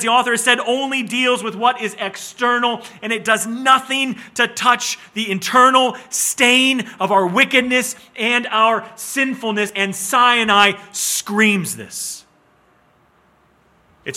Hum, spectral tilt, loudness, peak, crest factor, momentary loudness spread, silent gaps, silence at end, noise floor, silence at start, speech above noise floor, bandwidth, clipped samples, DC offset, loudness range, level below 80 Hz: none; -2 dB/octave; -16 LUFS; 0 dBFS; 18 dB; 11 LU; none; 0 s; -56 dBFS; 0 s; 39 dB; 17 kHz; under 0.1%; under 0.1%; 4 LU; -66 dBFS